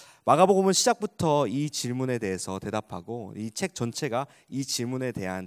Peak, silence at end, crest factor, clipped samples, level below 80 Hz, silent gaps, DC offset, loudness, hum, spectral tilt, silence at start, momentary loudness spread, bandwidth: -4 dBFS; 0 s; 22 dB; under 0.1%; -60 dBFS; none; under 0.1%; -27 LUFS; none; -4.5 dB/octave; 0 s; 15 LU; 16 kHz